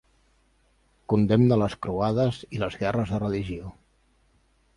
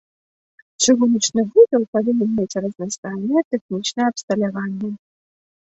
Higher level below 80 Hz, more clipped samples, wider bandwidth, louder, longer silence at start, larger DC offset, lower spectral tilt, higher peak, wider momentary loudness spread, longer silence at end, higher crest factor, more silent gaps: first, -50 dBFS vs -64 dBFS; neither; first, 11 kHz vs 8.2 kHz; second, -25 LUFS vs -19 LUFS; first, 1.1 s vs 0.8 s; neither; first, -8.5 dB/octave vs -4 dB/octave; second, -8 dBFS vs -2 dBFS; about the same, 12 LU vs 12 LU; first, 1.05 s vs 0.8 s; about the same, 18 dB vs 18 dB; second, none vs 1.88-1.93 s, 2.98-3.03 s, 3.45-3.51 s, 3.61-3.69 s, 4.23-4.28 s